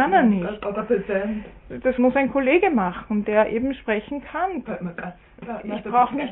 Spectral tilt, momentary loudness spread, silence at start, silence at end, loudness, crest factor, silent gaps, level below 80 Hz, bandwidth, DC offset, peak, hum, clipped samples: -11 dB/octave; 15 LU; 0 s; 0 s; -22 LUFS; 16 dB; none; -48 dBFS; 4 kHz; under 0.1%; -6 dBFS; none; under 0.1%